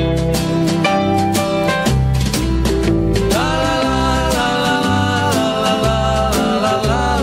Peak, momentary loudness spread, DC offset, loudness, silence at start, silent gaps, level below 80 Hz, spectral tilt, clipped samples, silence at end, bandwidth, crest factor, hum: -2 dBFS; 1 LU; under 0.1%; -16 LUFS; 0 s; none; -24 dBFS; -5 dB/octave; under 0.1%; 0 s; 16.5 kHz; 14 dB; none